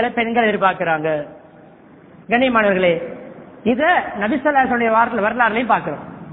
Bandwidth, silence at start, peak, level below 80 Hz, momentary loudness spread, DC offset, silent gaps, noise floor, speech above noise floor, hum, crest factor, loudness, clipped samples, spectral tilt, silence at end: 4.1 kHz; 0 s; 0 dBFS; -54 dBFS; 13 LU; under 0.1%; none; -44 dBFS; 27 dB; none; 18 dB; -17 LUFS; under 0.1%; -9.5 dB/octave; 0 s